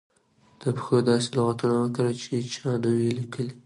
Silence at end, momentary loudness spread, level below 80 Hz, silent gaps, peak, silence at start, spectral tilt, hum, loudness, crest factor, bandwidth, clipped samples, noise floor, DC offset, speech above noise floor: 0.05 s; 8 LU; -66 dBFS; none; -8 dBFS; 0.6 s; -6.5 dB/octave; none; -26 LUFS; 16 dB; 11.5 kHz; under 0.1%; -61 dBFS; under 0.1%; 36 dB